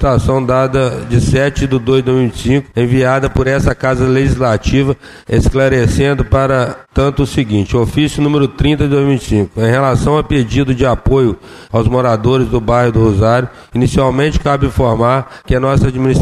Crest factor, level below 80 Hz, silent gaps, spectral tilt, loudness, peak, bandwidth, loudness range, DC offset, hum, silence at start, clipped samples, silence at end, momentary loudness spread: 10 dB; -24 dBFS; none; -7 dB/octave; -13 LUFS; -2 dBFS; 12.5 kHz; 1 LU; under 0.1%; none; 0 s; under 0.1%; 0 s; 4 LU